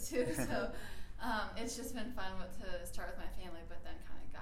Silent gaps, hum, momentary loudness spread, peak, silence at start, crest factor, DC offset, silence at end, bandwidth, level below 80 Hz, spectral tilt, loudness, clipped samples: none; none; 15 LU; -22 dBFS; 0 s; 16 dB; under 0.1%; 0 s; 16 kHz; -50 dBFS; -4 dB/octave; -43 LUFS; under 0.1%